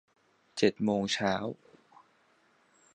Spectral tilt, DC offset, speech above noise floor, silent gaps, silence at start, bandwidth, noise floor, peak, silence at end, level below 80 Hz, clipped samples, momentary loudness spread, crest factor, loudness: -4.5 dB/octave; under 0.1%; 38 dB; none; 0.55 s; 9.8 kHz; -68 dBFS; -12 dBFS; 1.4 s; -68 dBFS; under 0.1%; 15 LU; 22 dB; -31 LUFS